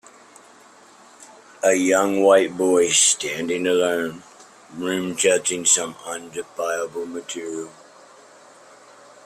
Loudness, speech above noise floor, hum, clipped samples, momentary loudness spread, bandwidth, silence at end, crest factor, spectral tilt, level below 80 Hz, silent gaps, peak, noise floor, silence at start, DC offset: -20 LUFS; 29 dB; none; under 0.1%; 16 LU; 16 kHz; 1.55 s; 20 dB; -2 dB/octave; -66 dBFS; none; -4 dBFS; -49 dBFS; 1.2 s; under 0.1%